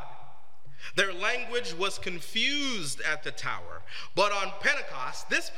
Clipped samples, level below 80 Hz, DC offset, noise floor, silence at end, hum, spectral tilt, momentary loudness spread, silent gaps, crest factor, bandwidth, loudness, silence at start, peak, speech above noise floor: under 0.1%; -66 dBFS; 3%; -56 dBFS; 0 s; none; -2 dB/octave; 11 LU; none; 22 dB; 16.5 kHz; -29 LUFS; 0 s; -8 dBFS; 25 dB